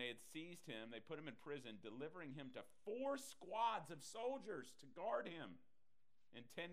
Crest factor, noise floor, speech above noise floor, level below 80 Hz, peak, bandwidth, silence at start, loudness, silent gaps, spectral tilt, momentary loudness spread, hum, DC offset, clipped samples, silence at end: 20 dB; under -90 dBFS; over 40 dB; under -90 dBFS; -30 dBFS; 15.5 kHz; 0 s; -50 LUFS; none; -4 dB/octave; 13 LU; none; under 0.1%; under 0.1%; 0 s